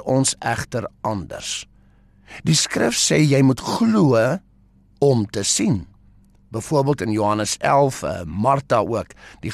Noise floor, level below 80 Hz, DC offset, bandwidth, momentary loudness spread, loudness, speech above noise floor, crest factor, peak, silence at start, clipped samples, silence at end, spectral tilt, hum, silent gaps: -54 dBFS; -48 dBFS; under 0.1%; 13 kHz; 12 LU; -20 LUFS; 34 dB; 14 dB; -6 dBFS; 0 s; under 0.1%; 0 s; -4.5 dB/octave; none; none